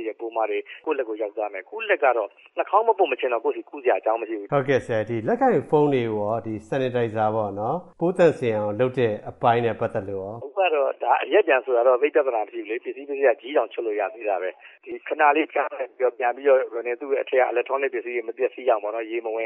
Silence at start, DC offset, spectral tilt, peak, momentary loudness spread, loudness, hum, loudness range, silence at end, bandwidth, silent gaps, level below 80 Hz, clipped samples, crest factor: 0 s; under 0.1%; -7.5 dB/octave; -6 dBFS; 10 LU; -23 LUFS; none; 2 LU; 0 s; 8.8 kHz; none; -66 dBFS; under 0.1%; 18 dB